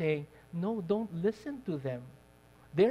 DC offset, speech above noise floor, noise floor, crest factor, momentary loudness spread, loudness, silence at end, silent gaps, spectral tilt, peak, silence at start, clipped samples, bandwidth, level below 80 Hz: under 0.1%; 25 dB; -59 dBFS; 18 dB; 11 LU; -35 LUFS; 0 s; none; -8.5 dB/octave; -16 dBFS; 0 s; under 0.1%; 13 kHz; -66 dBFS